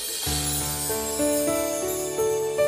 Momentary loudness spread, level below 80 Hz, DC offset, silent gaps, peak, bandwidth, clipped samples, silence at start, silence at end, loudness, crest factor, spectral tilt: 3 LU; -44 dBFS; under 0.1%; none; -12 dBFS; 15.5 kHz; under 0.1%; 0 s; 0 s; -25 LUFS; 14 dB; -3 dB/octave